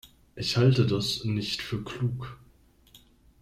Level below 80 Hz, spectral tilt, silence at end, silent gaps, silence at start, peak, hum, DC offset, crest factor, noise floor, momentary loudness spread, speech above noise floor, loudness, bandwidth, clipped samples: -54 dBFS; -6 dB/octave; 0.45 s; none; 0.05 s; -10 dBFS; none; under 0.1%; 20 dB; -59 dBFS; 12 LU; 33 dB; -27 LUFS; 14 kHz; under 0.1%